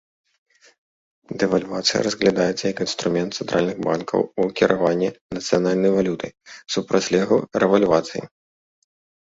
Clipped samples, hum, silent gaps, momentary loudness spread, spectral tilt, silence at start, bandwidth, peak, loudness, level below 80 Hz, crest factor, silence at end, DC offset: under 0.1%; none; 5.21-5.30 s; 8 LU; -5 dB/octave; 1.3 s; 8 kHz; -2 dBFS; -21 LUFS; -56 dBFS; 20 dB; 1.1 s; under 0.1%